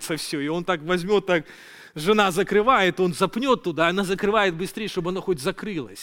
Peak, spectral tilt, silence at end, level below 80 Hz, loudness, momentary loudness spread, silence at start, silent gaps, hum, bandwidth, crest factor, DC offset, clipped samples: -2 dBFS; -4.5 dB/octave; 0 s; -52 dBFS; -23 LUFS; 9 LU; 0 s; none; none; 17 kHz; 20 dB; under 0.1%; under 0.1%